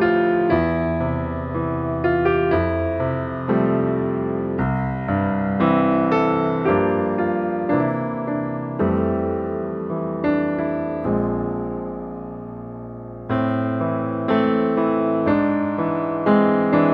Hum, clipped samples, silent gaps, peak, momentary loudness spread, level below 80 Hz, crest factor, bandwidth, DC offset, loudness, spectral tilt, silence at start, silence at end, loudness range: none; under 0.1%; none; -4 dBFS; 8 LU; -44 dBFS; 18 dB; 5.4 kHz; under 0.1%; -21 LUFS; -10 dB/octave; 0 s; 0 s; 5 LU